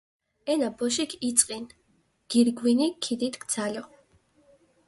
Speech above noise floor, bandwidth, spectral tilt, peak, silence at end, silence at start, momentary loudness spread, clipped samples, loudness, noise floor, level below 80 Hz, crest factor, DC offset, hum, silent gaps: 42 dB; 11.5 kHz; -2.5 dB/octave; -2 dBFS; 1 s; 0.45 s; 14 LU; under 0.1%; -26 LUFS; -68 dBFS; -70 dBFS; 26 dB; under 0.1%; none; none